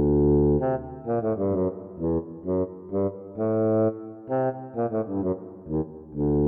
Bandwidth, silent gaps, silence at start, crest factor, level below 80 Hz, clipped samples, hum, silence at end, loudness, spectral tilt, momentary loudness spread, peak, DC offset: 2.9 kHz; none; 0 s; 14 dB; -40 dBFS; under 0.1%; none; 0 s; -26 LUFS; -14 dB/octave; 9 LU; -12 dBFS; under 0.1%